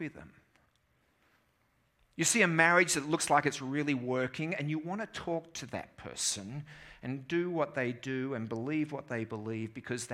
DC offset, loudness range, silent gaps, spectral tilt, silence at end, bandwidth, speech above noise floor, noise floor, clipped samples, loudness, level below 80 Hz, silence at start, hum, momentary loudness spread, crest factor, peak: under 0.1%; 7 LU; none; -3.5 dB/octave; 0 s; 16.5 kHz; 40 dB; -73 dBFS; under 0.1%; -32 LUFS; -70 dBFS; 0 s; none; 17 LU; 24 dB; -10 dBFS